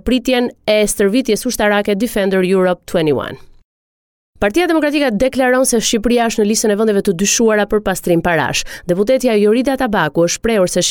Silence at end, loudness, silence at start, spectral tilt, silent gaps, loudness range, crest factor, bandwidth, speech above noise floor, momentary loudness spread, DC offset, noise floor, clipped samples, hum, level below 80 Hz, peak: 0 s; -14 LUFS; 0.05 s; -4 dB/octave; 3.64-4.33 s; 3 LU; 12 dB; 19 kHz; over 76 dB; 4 LU; under 0.1%; under -90 dBFS; under 0.1%; none; -38 dBFS; -4 dBFS